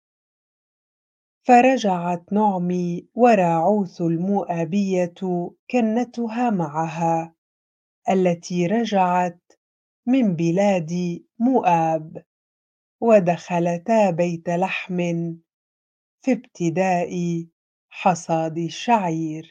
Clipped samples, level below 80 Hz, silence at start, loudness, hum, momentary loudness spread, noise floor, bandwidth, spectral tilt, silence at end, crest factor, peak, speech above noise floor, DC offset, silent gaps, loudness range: under 0.1%; -72 dBFS; 1.45 s; -21 LUFS; none; 10 LU; under -90 dBFS; 8.6 kHz; -7 dB/octave; 0.1 s; 20 dB; -2 dBFS; over 70 dB; under 0.1%; 5.59-5.67 s, 7.38-8.02 s, 9.57-10.03 s, 12.26-12.99 s, 15.53-16.18 s, 17.52-17.89 s; 5 LU